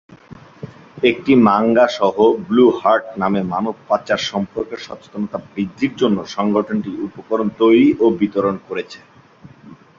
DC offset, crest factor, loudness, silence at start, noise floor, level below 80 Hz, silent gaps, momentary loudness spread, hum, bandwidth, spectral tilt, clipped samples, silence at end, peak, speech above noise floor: under 0.1%; 16 dB; -17 LUFS; 0.1 s; -44 dBFS; -54 dBFS; none; 15 LU; none; 7.4 kHz; -6.5 dB/octave; under 0.1%; 0.25 s; 0 dBFS; 28 dB